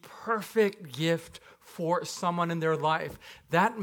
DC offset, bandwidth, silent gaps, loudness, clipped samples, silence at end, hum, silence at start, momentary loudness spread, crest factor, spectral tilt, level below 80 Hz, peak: under 0.1%; 18.5 kHz; none; -29 LUFS; under 0.1%; 0 s; none; 0.05 s; 18 LU; 20 dB; -5 dB/octave; -66 dBFS; -10 dBFS